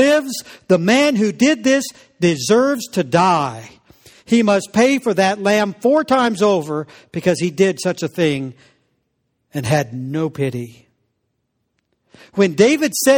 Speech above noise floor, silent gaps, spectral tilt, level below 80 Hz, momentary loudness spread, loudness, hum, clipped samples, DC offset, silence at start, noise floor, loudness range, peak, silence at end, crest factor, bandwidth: 55 dB; none; -5 dB/octave; -58 dBFS; 12 LU; -17 LUFS; none; under 0.1%; under 0.1%; 0 s; -71 dBFS; 8 LU; 0 dBFS; 0 s; 16 dB; over 20 kHz